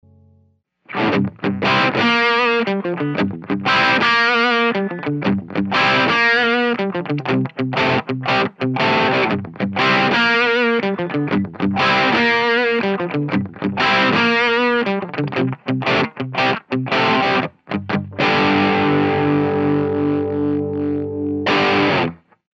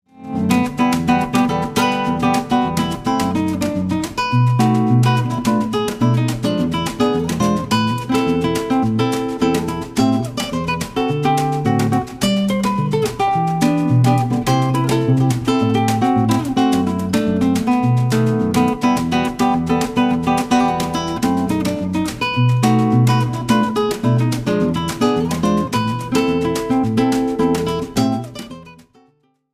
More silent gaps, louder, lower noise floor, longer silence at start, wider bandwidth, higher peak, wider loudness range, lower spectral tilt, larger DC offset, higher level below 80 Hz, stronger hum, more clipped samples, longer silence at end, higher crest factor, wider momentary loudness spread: neither; about the same, -17 LUFS vs -17 LUFS; about the same, -58 dBFS vs -59 dBFS; first, 0.9 s vs 0.15 s; second, 7.8 kHz vs 15.5 kHz; about the same, -4 dBFS vs -2 dBFS; about the same, 2 LU vs 2 LU; about the same, -6 dB/octave vs -6 dB/octave; neither; second, -58 dBFS vs -42 dBFS; neither; neither; second, 0.4 s vs 0.8 s; about the same, 14 dB vs 14 dB; first, 8 LU vs 5 LU